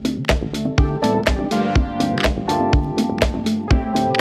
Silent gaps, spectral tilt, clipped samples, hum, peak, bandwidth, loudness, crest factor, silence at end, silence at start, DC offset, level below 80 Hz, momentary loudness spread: none; -6 dB/octave; under 0.1%; none; 0 dBFS; 14.5 kHz; -19 LUFS; 18 dB; 0 s; 0 s; under 0.1%; -24 dBFS; 3 LU